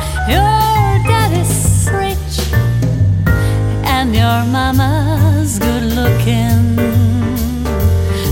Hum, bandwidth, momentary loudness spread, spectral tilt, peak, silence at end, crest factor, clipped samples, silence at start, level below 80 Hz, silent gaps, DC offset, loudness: none; 17 kHz; 4 LU; -5.5 dB/octave; 0 dBFS; 0 s; 12 dB; under 0.1%; 0 s; -22 dBFS; none; under 0.1%; -13 LUFS